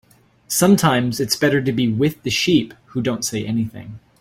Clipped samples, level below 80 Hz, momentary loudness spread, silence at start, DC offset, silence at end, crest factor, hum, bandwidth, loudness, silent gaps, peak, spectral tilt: under 0.1%; -52 dBFS; 11 LU; 0.5 s; under 0.1%; 0.25 s; 16 dB; none; 16.5 kHz; -19 LUFS; none; -2 dBFS; -4.5 dB/octave